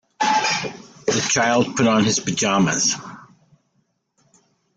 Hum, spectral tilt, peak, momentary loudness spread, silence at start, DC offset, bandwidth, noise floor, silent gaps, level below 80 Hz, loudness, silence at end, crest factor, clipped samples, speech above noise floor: none; -3 dB/octave; -4 dBFS; 10 LU; 0.2 s; under 0.1%; 10.5 kHz; -68 dBFS; none; -58 dBFS; -19 LUFS; 1.5 s; 18 dB; under 0.1%; 49 dB